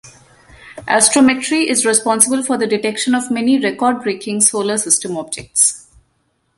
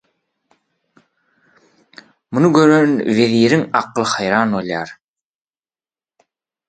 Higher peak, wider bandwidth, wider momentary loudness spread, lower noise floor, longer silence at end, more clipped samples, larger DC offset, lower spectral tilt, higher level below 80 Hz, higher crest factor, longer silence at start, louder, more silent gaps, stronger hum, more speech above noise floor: about the same, 0 dBFS vs 0 dBFS; first, 14 kHz vs 9.2 kHz; second, 9 LU vs 12 LU; second, -64 dBFS vs under -90 dBFS; second, 0.8 s vs 1.75 s; neither; neither; second, -2 dB/octave vs -5.5 dB/octave; about the same, -56 dBFS vs -60 dBFS; about the same, 16 dB vs 18 dB; second, 0.05 s vs 2.3 s; about the same, -14 LUFS vs -15 LUFS; neither; neither; second, 49 dB vs over 76 dB